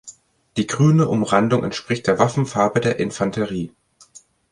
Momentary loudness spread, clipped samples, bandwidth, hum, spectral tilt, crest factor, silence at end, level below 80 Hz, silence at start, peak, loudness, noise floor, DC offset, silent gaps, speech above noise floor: 10 LU; under 0.1%; 11 kHz; none; -6 dB/octave; 18 dB; 0.35 s; -52 dBFS; 0.05 s; -2 dBFS; -20 LUFS; -49 dBFS; under 0.1%; none; 31 dB